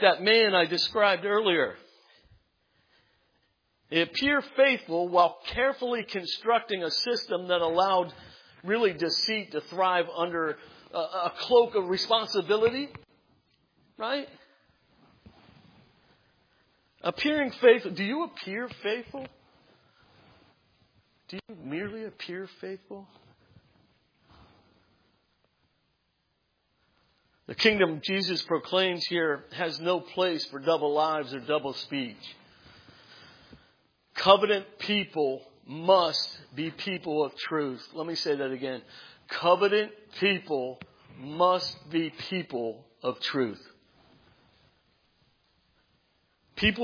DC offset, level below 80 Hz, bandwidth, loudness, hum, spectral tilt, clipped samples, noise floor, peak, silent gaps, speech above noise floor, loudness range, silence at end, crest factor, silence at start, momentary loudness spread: under 0.1%; -64 dBFS; 5.4 kHz; -27 LUFS; none; -4.5 dB/octave; under 0.1%; -75 dBFS; -4 dBFS; none; 48 dB; 14 LU; 0 s; 26 dB; 0 s; 16 LU